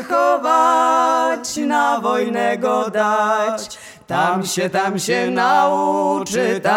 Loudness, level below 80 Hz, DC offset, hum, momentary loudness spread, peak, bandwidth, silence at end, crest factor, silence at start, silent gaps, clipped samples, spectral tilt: -17 LUFS; -62 dBFS; under 0.1%; none; 5 LU; -4 dBFS; 17.5 kHz; 0 s; 14 dB; 0 s; none; under 0.1%; -4 dB/octave